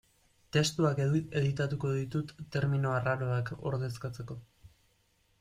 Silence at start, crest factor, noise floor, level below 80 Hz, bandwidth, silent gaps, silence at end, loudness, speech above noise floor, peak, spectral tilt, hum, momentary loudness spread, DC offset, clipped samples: 0.55 s; 18 dB; -71 dBFS; -60 dBFS; 13 kHz; none; 0.75 s; -32 LUFS; 40 dB; -16 dBFS; -6 dB/octave; none; 11 LU; under 0.1%; under 0.1%